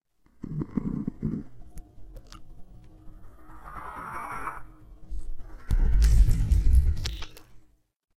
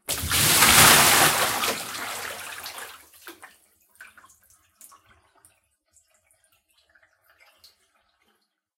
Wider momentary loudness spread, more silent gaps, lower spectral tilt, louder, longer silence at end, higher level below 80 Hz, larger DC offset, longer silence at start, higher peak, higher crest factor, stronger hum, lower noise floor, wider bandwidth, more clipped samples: first, 26 LU vs 23 LU; neither; first, -6.5 dB/octave vs -1 dB/octave; second, -28 LUFS vs -17 LUFS; second, 0.6 s vs 4.75 s; first, -28 dBFS vs -50 dBFS; neither; first, 0.4 s vs 0.1 s; second, -8 dBFS vs 0 dBFS; second, 18 dB vs 24 dB; neither; second, -52 dBFS vs -71 dBFS; second, 13.5 kHz vs 16.5 kHz; neither